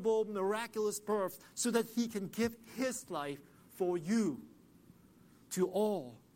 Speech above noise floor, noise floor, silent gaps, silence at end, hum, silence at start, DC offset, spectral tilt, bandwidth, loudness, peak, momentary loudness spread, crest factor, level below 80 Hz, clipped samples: 27 dB; -63 dBFS; none; 0.15 s; none; 0 s; under 0.1%; -4.5 dB/octave; 16.5 kHz; -36 LUFS; -18 dBFS; 8 LU; 18 dB; -72 dBFS; under 0.1%